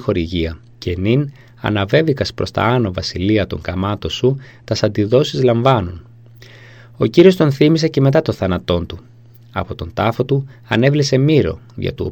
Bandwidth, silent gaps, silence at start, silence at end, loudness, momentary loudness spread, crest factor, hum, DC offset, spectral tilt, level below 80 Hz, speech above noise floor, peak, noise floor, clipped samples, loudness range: 16 kHz; none; 0 s; 0 s; -16 LUFS; 12 LU; 16 dB; none; 0.2%; -7 dB/octave; -40 dBFS; 25 dB; 0 dBFS; -41 dBFS; under 0.1%; 3 LU